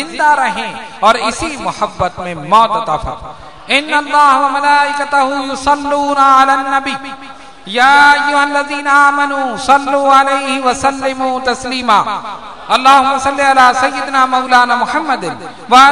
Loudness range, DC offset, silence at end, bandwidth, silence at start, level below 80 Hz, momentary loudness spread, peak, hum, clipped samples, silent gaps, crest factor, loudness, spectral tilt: 4 LU; 1%; 0 s; 12 kHz; 0 s; -42 dBFS; 12 LU; 0 dBFS; none; 1%; none; 12 dB; -11 LUFS; -2.5 dB/octave